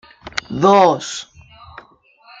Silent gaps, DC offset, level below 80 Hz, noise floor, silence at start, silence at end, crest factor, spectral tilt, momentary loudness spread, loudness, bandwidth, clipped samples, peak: none; under 0.1%; -54 dBFS; -50 dBFS; 0.25 s; 0.6 s; 18 dB; -4.5 dB/octave; 16 LU; -16 LUFS; 9.2 kHz; under 0.1%; 0 dBFS